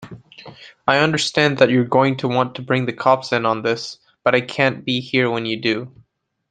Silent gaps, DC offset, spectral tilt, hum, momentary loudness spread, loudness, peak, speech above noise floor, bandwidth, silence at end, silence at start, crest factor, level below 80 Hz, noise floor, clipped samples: none; under 0.1%; -5 dB/octave; none; 10 LU; -18 LUFS; -2 dBFS; 42 dB; 9.4 kHz; 0.6 s; 0 s; 18 dB; -60 dBFS; -60 dBFS; under 0.1%